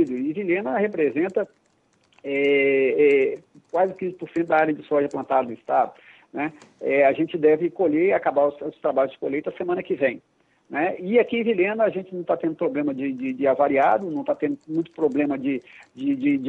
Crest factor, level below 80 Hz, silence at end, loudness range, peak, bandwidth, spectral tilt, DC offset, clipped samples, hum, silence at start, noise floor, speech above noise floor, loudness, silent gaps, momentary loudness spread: 16 dB; -70 dBFS; 0 s; 2 LU; -6 dBFS; 8 kHz; -8 dB/octave; under 0.1%; under 0.1%; none; 0 s; -63 dBFS; 41 dB; -23 LUFS; none; 10 LU